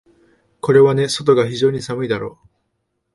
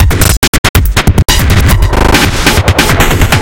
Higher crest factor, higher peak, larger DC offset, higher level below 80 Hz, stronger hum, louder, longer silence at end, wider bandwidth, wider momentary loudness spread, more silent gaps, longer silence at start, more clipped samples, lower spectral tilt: first, 18 dB vs 6 dB; about the same, 0 dBFS vs 0 dBFS; neither; second, -56 dBFS vs -12 dBFS; neither; second, -16 LUFS vs -8 LUFS; first, 0.85 s vs 0 s; second, 11.5 kHz vs over 20 kHz; first, 12 LU vs 1 LU; second, none vs 0.37-0.42 s, 0.48-0.74 s; first, 0.65 s vs 0 s; second, under 0.1% vs 3%; first, -5.5 dB/octave vs -4 dB/octave